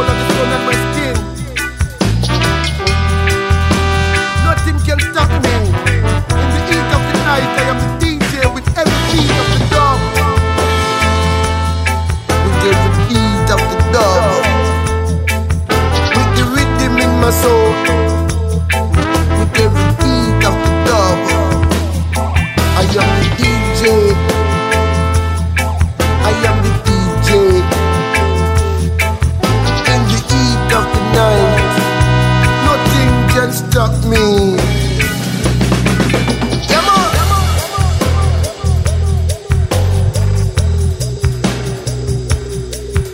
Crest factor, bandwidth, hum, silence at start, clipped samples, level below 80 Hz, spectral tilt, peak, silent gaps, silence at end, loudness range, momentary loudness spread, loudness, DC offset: 12 dB; 16.5 kHz; none; 0 s; under 0.1%; -20 dBFS; -5.5 dB/octave; 0 dBFS; none; 0 s; 2 LU; 5 LU; -13 LUFS; under 0.1%